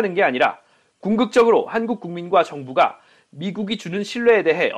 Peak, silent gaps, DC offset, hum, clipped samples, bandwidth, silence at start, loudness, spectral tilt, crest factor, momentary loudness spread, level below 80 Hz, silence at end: -4 dBFS; none; under 0.1%; none; under 0.1%; 10 kHz; 0 s; -19 LUFS; -5.5 dB/octave; 16 dB; 11 LU; -62 dBFS; 0 s